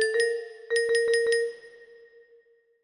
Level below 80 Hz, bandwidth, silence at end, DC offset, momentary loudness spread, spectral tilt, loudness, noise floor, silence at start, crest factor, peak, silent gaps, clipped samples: -74 dBFS; 10.5 kHz; 1 s; under 0.1%; 11 LU; 1 dB/octave; -26 LUFS; -61 dBFS; 0 s; 16 dB; -12 dBFS; none; under 0.1%